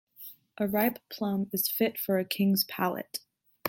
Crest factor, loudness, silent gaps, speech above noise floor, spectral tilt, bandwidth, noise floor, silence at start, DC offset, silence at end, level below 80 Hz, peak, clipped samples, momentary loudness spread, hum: 20 dB; -29 LUFS; none; 21 dB; -5 dB/octave; 17 kHz; -50 dBFS; 0.2 s; under 0.1%; 0 s; -72 dBFS; -12 dBFS; under 0.1%; 14 LU; none